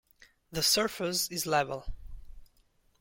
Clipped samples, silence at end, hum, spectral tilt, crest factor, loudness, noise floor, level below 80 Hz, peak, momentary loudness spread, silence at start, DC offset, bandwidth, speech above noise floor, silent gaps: under 0.1%; 0.55 s; none; -2 dB/octave; 20 dB; -29 LUFS; -68 dBFS; -50 dBFS; -14 dBFS; 18 LU; 0.5 s; under 0.1%; 17 kHz; 38 dB; none